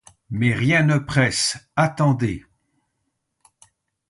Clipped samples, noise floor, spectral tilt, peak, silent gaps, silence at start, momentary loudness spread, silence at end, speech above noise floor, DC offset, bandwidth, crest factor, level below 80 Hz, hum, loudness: under 0.1%; -75 dBFS; -5 dB/octave; -6 dBFS; none; 0.3 s; 8 LU; 1.7 s; 55 dB; under 0.1%; 11.5 kHz; 18 dB; -50 dBFS; none; -20 LUFS